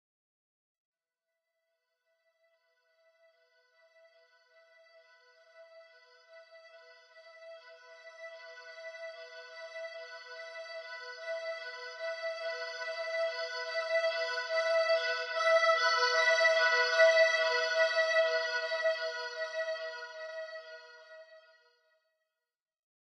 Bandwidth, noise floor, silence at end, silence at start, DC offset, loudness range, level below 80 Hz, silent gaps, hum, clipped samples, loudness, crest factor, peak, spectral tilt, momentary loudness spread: 9.8 kHz; under -90 dBFS; 1.6 s; 5.55 s; under 0.1%; 22 LU; under -90 dBFS; none; none; under 0.1%; -30 LUFS; 22 dB; -14 dBFS; 6 dB/octave; 23 LU